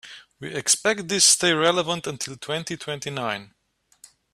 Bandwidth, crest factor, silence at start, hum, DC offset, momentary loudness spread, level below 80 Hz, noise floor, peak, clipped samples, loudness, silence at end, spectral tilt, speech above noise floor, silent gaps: 15.5 kHz; 22 dB; 0.05 s; none; under 0.1%; 16 LU; -66 dBFS; -55 dBFS; -4 dBFS; under 0.1%; -21 LUFS; 0.9 s; -1.5 dB/octave; 31 dB; none